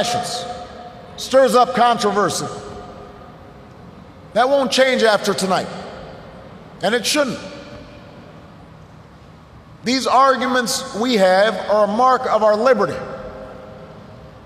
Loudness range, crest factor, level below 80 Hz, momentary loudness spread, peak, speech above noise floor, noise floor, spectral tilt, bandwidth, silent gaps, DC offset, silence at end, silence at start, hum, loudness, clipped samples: 9 LU; 18 dB; -52 dBFS; 23 LU; -2 dBFS; 26 dB; -43 dBFS; -3.5 dB/octave; 15.5 kHz; none; under 0.1%; 0.05 s; 0 s; none; -17 LUFS; under 0.1%